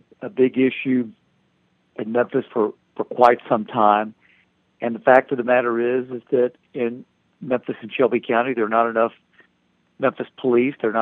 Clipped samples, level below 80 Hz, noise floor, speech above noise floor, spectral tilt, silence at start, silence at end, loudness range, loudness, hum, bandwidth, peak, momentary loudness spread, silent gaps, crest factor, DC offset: under 0.1%; -72 dBFS; -65 dBFS; 45 dB; -8 dB/octave; 0.2 s; 0 s; 4 LU; -20 LUFS; none; 5.6 kHz; 0 dBFS; 13 LU; none; 22 dB; under 0.1%